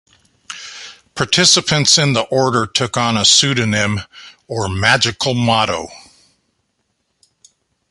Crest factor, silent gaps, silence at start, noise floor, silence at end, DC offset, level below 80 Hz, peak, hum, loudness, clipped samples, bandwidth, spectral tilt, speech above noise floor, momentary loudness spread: 18 dB; none; 0.5 s; -68 dBFS; 1.9 s; under 0.1%; -44 dBFS; 0 dBFS; none; -14 LUFS; under 0.1%; 11.5 kHz; -2.5 dB/octave; 53 dB; 21 LU